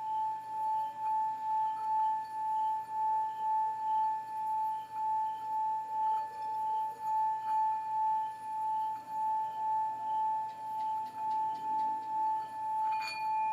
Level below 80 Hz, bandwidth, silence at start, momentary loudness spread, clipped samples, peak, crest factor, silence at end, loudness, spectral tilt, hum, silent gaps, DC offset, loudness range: -84 dBFS; 13 kHz; 0 s; 4 LU; under 0.1%; -26 dBFS; 8 dB; 0 s; -34 LUFS; -3 dB/octave; none; none; under 0.1%; 2 LU